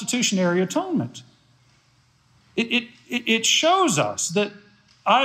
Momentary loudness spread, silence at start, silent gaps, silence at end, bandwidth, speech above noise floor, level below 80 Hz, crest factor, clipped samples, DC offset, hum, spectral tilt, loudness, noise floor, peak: 12 LU; 0 s; none; 0 s; 15.5 kHz; 38 dB; -72 dBFS; 18 dB; under 0.1%; under 0.1%; none; -3 dB/octave; -21 LUFS; -60 dBFS; -6 dBFS